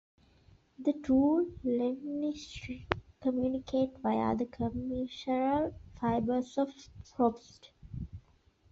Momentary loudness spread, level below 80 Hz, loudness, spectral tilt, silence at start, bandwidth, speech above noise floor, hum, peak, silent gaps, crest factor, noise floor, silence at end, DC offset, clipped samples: 16 LU; -56 dBFS; -33 LUFS; -6 dB/octave; 0.8 s; 7.6 kHz; 34 dB; none; -6 dBFS; none; 28 dB; -66 dBFS; 0.5 s; under 0.1%; under 0.1%